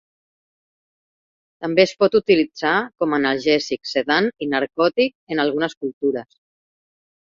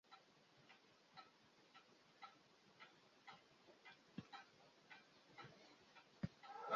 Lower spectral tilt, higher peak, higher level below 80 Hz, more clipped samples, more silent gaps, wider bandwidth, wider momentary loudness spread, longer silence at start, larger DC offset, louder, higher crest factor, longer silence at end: about the same, -5 dB/octave vs -4 dB/octave; first, -2 dBFS vs -30 dBFS; first, -64 dBFS vs -82 dBFS; neither; first, 5.15-5.27 s, 5.77-5.81 s, 5.93-6.01 s vs none; about the same, 7.6 kHz vs 7.2 kHz; second, 8 LU vs 14 LU; first, 1.6 s vs 0.05 s; neither; first, -20 LUFS vs -62 LUFS; second, 20 dB vs 30 dB; first, 1 s vs 0 s